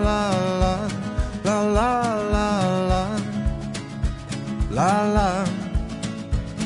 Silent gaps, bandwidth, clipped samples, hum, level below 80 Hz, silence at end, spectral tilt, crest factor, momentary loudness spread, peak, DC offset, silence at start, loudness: none; 11 kHz; under 0.1%; none; -30 dBFS; 0 s; -6 dB/octave; 18 dB; 9 LU; -6 dBFS; under 0.1%; 0 s; -23 LUFS